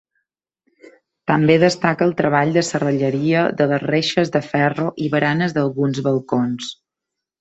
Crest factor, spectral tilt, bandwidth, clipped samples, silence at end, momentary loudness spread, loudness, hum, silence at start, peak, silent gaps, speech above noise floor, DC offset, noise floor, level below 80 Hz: 18 dB; -6 dB/octave; 8.2 kHz; under 0.1%; 0.7 s; 6 LU; -18 LUFS; none; 1.25 s; -2 dBFS; none; 65 dB; under 0.1%; -83 dBFS; -58 dBFS